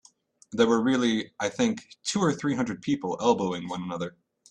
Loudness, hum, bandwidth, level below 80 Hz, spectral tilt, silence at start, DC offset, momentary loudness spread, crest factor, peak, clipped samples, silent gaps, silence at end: -27 LUFS; none; 10 kHz; -64 dBFS; -5 dB/octave; 0.5 s; under 0.1%; 11 LU; 20 dB; -8 dBFS; under 0.1%; none; 0.4 s